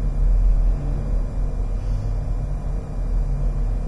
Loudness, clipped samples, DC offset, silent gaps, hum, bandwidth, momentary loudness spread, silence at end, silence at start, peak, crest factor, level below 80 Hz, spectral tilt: -26 LUFS; under 0.1%; under 0.1%; none; none; 2.5 kHz; 6 LU; 0 s; 0 s; -8 dBFS; 12 dB; -20 dBFS; -8.5 dB/octave